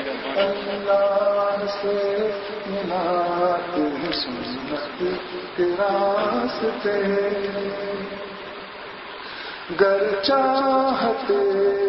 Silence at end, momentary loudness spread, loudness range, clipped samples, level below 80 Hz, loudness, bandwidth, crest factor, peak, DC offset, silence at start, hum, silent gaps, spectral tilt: 0 s; 13 LU; 3 LU; under 0.1%; -58 dBFS; -23 LUFS; 6 kHz; 18 dB; -4 dBFS; under 0.1%; 0 s; none; none; -7.5 dB/octave